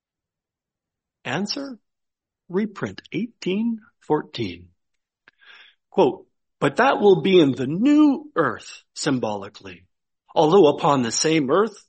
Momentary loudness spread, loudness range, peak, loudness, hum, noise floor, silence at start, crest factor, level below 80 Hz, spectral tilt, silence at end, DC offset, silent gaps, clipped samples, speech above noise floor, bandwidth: 17 LU; 10 LU; -4 dBFS; -21 LUFS; none; -88 dBFS; 1.25 s; 18 dB; -66 dBFS; -5 dB/octave; 0.15 s; under 0.1%; none; under 0.1%; 67 dB; 8.4 kHz